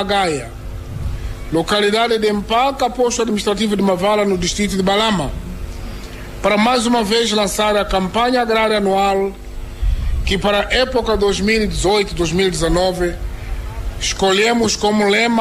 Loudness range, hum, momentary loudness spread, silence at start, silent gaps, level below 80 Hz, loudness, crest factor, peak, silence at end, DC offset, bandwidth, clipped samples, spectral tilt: 2 LU; none; 15 LU; 0 s; none; -28 dBFS; -16 LUFS; 12 dB; -4 dBFS; 0 s; 0.2%; 15.5 kHz; under 0.1%; -4 dB/octave